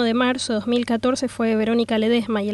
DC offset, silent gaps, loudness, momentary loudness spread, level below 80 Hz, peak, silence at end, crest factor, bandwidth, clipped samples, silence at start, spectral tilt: under 0.1%; none; -21 LUFS; 3 LU; -56 dBFS; -8 dBFS; 0 s; 12 dB; 11.5 kHz; under 0.1%; 0 s; -4.5 dB/octave